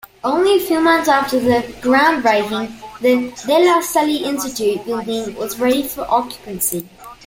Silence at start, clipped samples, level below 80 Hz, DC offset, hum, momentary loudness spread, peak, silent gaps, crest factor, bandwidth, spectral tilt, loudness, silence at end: 0.25 s; under 0.1%; -50 dBFS; under 0.1%; none; 10 LU; -2 dBFS; none; 16 dB; 17 kHz; -3.5 dB/octave; -17 LUFS; 0.15 s